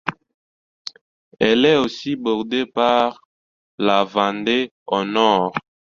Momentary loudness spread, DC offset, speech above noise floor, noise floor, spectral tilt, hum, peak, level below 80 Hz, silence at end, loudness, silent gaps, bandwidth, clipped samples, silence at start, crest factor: 14 LU; under 0.1%; over 72 dB; under -90 dBFS; -5 dB/octave; none; -2 dBFS; -60 dBFS; 0.35 s; -19 LUFS; 0.34-0.85 s, 1.01-1.31 s, 3.25-3.78 s, 4.71-4.86 s; 7.4 kHz; under 0.1%; 0.05 s; 18 dB